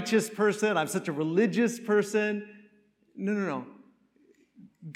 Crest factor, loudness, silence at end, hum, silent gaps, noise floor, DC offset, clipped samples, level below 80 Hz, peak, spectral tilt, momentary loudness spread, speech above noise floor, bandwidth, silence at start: 18 dB; -28 LUFS; 0 s; none; none; -64 dBFS; under 0.1%; under 0.1%; -84 dBFS; -12 dBFS; -5 dB/octave; 12 LU; 37 dB; 15.5 kHz; 0 s